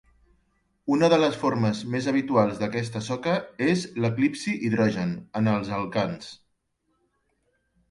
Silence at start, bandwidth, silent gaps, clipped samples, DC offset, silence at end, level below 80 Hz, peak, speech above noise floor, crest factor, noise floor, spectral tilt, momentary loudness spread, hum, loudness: 0.85 s; 11.5 kHz; none; under 0.1%; under 0.1%; 1.55 s; -60 dBFS; -8 dBFS; 49 dB; 18 dB; -73 dBFS; -6.5 dB/octave; 9 LU; none; -25 LUFS